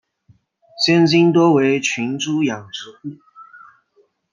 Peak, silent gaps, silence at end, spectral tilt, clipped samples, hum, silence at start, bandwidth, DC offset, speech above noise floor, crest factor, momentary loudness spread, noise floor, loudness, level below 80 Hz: -2 dBFS; none; 0.75 s; -5 dB/octave; under 0.1%; none; 0.75 s; 7.4 kHz; under 0.1%; 44 dB; 16 dB; 20 LU; -60 dBFS; -16 LUFS; -66 dBFS